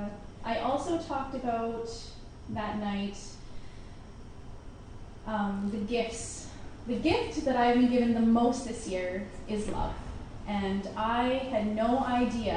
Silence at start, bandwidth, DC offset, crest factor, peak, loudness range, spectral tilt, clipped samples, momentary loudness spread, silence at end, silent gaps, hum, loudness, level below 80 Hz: 0 s; 10.5 kHz; under 0.1%; 16 dB; -14 dBFS; 9 LU; -5.5 dB/octave; under 0.1%; 23 LU; 0 s; none; none; -30 LUFS; -46 dBFS